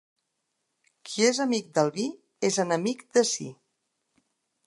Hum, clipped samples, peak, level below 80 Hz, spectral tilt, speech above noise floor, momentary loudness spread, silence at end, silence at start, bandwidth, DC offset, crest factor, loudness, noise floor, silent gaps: none; under 0.1%; -8 dBFS; -82 dBFS; -3.5 dB/octave; 54 dB; 10 LU; 1.15 s; 1.05 s; 11.5 kHz; under 0.1%; 20 dB; -26 LUFS; -79 dBFS; none